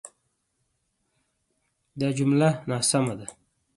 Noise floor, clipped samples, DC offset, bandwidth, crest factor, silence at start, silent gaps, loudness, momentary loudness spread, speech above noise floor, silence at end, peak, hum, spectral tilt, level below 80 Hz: -75 dBFS; under 0.1%; under 0.1%; 11.5 kHz; 20 dB; 0.05 s; none; -24 LUFS; 13 LU; 51 dB; 0.45 s; -8 dBFS; none; -5 dB/octave; -66 dBFS